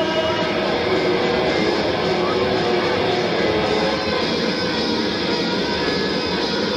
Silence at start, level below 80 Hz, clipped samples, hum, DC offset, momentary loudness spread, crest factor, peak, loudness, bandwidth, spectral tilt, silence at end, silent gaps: 0 s; -44 dBFS; under 0.1%; none; under 0.1%; 2 LU; 12 dB; -8 dBFS; -19 LUFS; 12.5 kHz; -5 dB/octave; 0 s; none